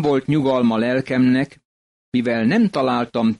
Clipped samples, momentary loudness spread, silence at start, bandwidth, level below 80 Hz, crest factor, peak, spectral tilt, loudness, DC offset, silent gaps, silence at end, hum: under 0.1%; 5 LU; 0 s; 10.5 kHz; -56 dBFS; 10 dB; -8 dBFS; -7.5 dB/octave; -19 LUFS; under 0.1%; 1.65-2.12 s; 0.05 s; none